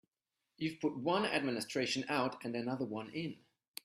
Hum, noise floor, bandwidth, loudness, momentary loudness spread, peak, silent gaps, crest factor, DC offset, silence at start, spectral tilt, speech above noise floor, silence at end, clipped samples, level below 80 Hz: none; -89 dBFS; 15 kHz; -37 LUFS; 9 LU; -18 dBFS; none; 20 dB; under 0.1%; 0.6 s; -4.5 dB/octave; 53 dB; 0.5 s; under 0.1%; -78 dBFS